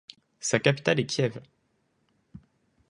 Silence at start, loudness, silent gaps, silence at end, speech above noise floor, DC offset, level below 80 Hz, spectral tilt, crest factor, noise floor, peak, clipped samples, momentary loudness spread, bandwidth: 0.4 s; -26 LUFS; none; 0.5 s; 46 dB; under 0.1%; -66 dBFS; -4.5 dB/octave; 24 dB; -72 dBFS; -6 dBFS; under 0.1%; 9 LU; 11 kHz